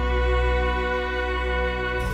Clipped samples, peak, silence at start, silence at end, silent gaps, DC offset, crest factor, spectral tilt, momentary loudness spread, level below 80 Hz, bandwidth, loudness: under 0.1%; -12 dBFS; 0 s; 0 s; none; under 0.1%; 12 dB; -6.5 dB/octave; 3 LU; -26 dBFS; 8.2 kHz; -24 LUFS